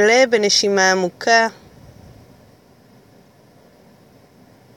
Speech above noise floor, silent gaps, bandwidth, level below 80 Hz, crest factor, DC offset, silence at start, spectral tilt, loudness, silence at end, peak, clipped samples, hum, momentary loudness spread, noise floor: 35 dB; none; 17 kHz; -60 dBFS; 18 dB; under 0.1%; 0 s; -2 dB/octave; -15 LUFS; 3.25 s; -2 dBFS; under 0.1%; none; 5 LU; -50 dBFS